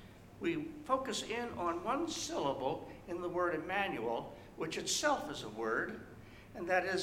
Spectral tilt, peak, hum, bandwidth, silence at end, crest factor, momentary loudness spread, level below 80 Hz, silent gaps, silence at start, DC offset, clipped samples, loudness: -3 dB/octave; -18 dBFS; none; 16.5 kHz; 0 s; 20 dB; 12 LU; -64 dBFS; none; 0 s; under 0.1%; under 0.1%; -37 LUFS